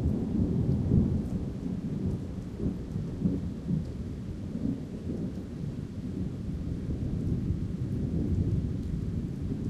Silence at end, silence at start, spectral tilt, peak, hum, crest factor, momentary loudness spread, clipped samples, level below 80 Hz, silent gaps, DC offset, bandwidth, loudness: 0 s; 0 s; -9.5 dB/octave; -12 dBFS; none; 20 dB; 9 LU; under 0.1%; -40 dBFS; none; under 0.1%; 11.5 kHz; -32 LUFS